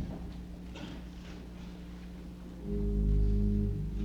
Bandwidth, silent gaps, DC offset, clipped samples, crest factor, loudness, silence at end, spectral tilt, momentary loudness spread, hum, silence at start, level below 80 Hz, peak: 7 kHz; none; under 0.1%; under 0.1%; 14 dB; -36 LUFS; 0 s; -8.5 dB/octave; 16 LU; none; 0 s; -36 dBFS; -18 dBFS